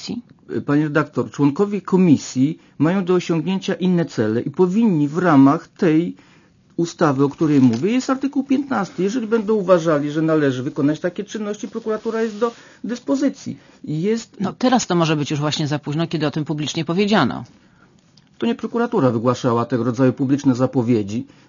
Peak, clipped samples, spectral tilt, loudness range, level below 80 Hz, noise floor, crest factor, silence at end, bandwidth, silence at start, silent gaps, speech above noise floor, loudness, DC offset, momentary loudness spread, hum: -2 dBFS; under 0.1%; -6.5 dB/octave; 5 LU; -62 dBFS; -53 dBFS; 18 dB; 0.25 s; 7.4 kHz; 0 s; none; 34 dB; -19 LUFS; under 0.1%; 11 LU; none